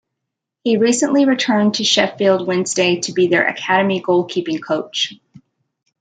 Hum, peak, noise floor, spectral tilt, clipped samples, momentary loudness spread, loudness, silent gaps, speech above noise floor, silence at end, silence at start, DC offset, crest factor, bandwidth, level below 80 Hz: none; -2 dBFS; -80 dBFS; -3.5 dB/octave; under 0.1%; 7 LU; -16 LUFS; none; 64 dB; 0.85 s; 0.65 s; under 0.1%; 16 dB; 9.4 kHz; -64 dBFS